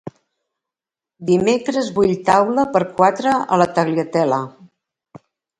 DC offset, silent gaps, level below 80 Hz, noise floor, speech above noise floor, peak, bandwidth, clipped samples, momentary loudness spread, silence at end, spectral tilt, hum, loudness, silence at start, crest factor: under 0.1%; none; -56 dBFS; -88 dBFS; 72 dB; 0 dBFS; 11.5 kHz; under 0.1%; 7 LU; 0.4 s; -6 dB/octave; none; -17 LUFS; 0.05 s; 18 dB